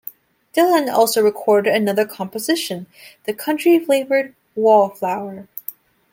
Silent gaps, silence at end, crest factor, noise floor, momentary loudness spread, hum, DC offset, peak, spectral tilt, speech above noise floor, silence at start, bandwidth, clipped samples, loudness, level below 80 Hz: none; 0.4 s; 16 dB; -39 dBFS; 16 LU; none; under 0.1%; -2 dBFS; -4 dB/octave; 22 dB; 0.55 s; 17 kHz; under 0.1%; -18 LUFS; -70 dBFS